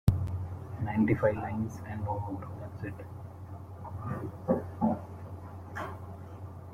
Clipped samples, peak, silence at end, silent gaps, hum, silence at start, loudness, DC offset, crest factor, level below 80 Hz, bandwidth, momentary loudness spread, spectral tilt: under 0.1%; -10 dBFS; 0 s; none; none; 0.05 s; -34 LUFS; under 0.1%; 24 dB; -50 dBFS; 15 kHz; 16 LU; -9 dB/octave